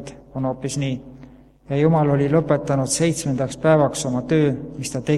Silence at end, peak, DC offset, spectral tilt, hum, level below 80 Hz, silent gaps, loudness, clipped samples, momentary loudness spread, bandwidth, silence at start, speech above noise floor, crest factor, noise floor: 0 s; -2 dBFS; under 0.1%; -6 dB/octave; none; -48 dBFS; none; -20 LUFS; under 0.1%; 10 LU; 13 kHz; 0 s; 26 dB; 18 dB; -45 dBFS